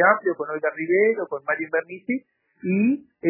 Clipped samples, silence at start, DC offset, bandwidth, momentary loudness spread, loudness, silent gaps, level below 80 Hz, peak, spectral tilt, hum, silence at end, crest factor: under 0.1%; 0 s; under 0.1%; 3 kHz; 9 LU; -24 LUFS; none; -74 dBFS; -2 dBFS; -12.5 dB/octave; none; 0 s; 20 dB